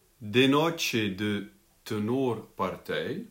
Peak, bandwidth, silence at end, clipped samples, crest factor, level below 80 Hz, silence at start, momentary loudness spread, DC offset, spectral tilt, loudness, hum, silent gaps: -10 dBFS; 16.5 kHz; 0.05 s; under 0.1%; 20 dB; -66 dBFS; 0.2 s; 12 LU; under 0.1%; -5 dB/octave; -28 LUFS; none; none